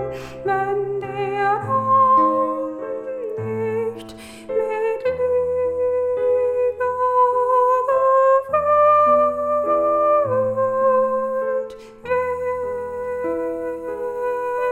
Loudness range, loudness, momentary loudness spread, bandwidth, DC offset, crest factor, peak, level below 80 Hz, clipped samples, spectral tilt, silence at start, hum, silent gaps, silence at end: 7 LU; -20 LUFS; 12 LU; 9.4 kHz; under 0.1%; 14 dB; -6 dBFS; -54 dBFS; under 0.1%; -7 dB/octave; 0 s; none; none; 0 s